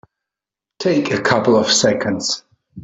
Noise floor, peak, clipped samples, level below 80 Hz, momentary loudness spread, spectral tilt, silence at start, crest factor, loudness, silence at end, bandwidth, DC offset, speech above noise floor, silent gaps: -86 dBFS; -2 dBFS; under 0.1%; -58 dBFS; 9 LU; -3.5 dB/octave; 0.8 s; 16 dB; -16 LUFS; 0 s; 8.4 kHz; under 0.1%; 70 dB; none